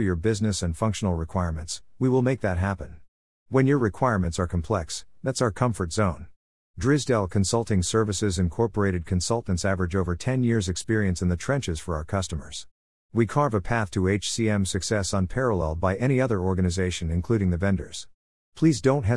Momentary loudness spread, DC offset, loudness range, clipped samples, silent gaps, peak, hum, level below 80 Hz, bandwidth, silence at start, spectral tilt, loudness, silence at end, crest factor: 7 LU; 0.4%; 2 LU; under 0.1%; 3.08-3.46 s, 6.36-6.74 s, 12.71-13.09 s, 18.14-18.52 s; -6 dBFS; none; -44 dBFS; 12 kHz; 0 s; -5.5 dB/octave; -25 LUFS; 0 s; 18 dB